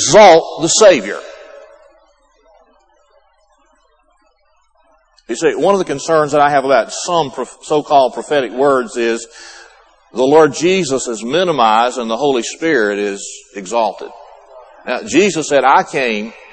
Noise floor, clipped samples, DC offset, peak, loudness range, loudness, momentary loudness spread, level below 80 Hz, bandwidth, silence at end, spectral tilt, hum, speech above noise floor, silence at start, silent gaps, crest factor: -56 dBFS; under 0.1%; under 0.1%; 0 dBFS; 5 LU; -13 LUFS; 17 LU; -52 dBFS; 8.8 kHz; 0.2 s; -3.5 dB/octave; none; 43 dB; 0 s; none; 14 dB